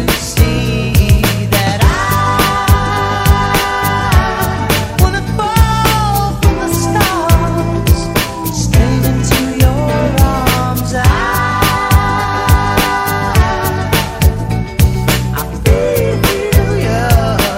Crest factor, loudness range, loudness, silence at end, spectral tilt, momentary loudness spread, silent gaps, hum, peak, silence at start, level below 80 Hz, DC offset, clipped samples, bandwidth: 12 dB; 1 LU; -12 LUFS; 0 s; -5 dB/octave; 4 LU; none; none; 0 dBFS; 0 s; -18 dBFS; under 0.1%; 0.3%; 16.5 kHz